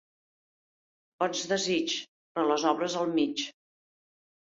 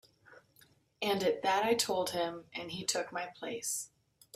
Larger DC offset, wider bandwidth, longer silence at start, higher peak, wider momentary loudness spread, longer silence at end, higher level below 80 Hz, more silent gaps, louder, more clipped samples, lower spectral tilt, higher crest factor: neither; second, 8 kHz vs 16 kHz; first, 1.2 s vs 0.3 s; first, -12 dBFS vs -16 dBFS; second, 8 LU vs 11 LU; first, 1.1 s vs 0.5 s; about the same, -76 dBFS vs -74 dBFS; first, 2.08-2.35 s vs none; first, -29 LUFS vs -34 LUFS; neither; about the same, -3 dB/octave vs -2.5 dB/octave; about the same, 20 dB vs 20 dB